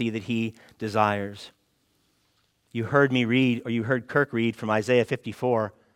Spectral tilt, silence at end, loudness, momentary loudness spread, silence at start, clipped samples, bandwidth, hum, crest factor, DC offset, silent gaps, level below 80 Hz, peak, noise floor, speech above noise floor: -6.5 dB/octave; 0.25 s; -25 LUFS; 13 LU; 0 s; under 0.1%; 14 kHz; none; 20 dB; under 0.1%; none; -68 dBFS; -6 dBFS; -69 dBFS; 44 dB